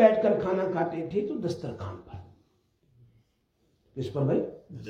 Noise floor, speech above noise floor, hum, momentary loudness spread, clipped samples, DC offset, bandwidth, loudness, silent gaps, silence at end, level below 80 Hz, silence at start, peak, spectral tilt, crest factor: -71 dBFS; 42 dB; none; 19 LU; under 0.1%; under 0.1%; 8.8 kHz; -29 LUFS; none; 0 s; -64 dBFS; 0 s; -6 dBFS; -8 dB/octave; 24 dB